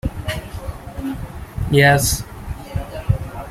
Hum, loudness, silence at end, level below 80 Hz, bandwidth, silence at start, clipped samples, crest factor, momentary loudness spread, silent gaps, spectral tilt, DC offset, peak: none; -19 LUFS; 0 s; -32 dBFS; 16 kHz; 0.05 s; under 0.1%; 20 dB; 19 LU; none; -4.5 dB/octave; under 0.1%; -2 dBFS